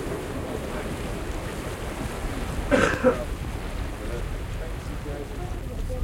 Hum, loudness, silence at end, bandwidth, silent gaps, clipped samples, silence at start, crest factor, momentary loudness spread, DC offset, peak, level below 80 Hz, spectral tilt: none; -29 LUFS; 0 s; 16.5 kHz; none; under 0.1%; 0 s; 22 dB; 12 LU; under 0.1%; -6 dBFS; -34 dBFS; -5.5 dB/octave